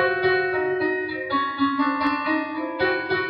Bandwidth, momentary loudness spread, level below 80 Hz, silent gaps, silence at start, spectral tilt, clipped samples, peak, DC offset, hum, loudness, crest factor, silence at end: 5.4 kHz; 4 LU; -60 dBFS; none; 0 s; -7.5 dB/octave; under 0.1%; -10 dBFS; under 0.1%; none; -23 LUFS; 14 dB; 0 s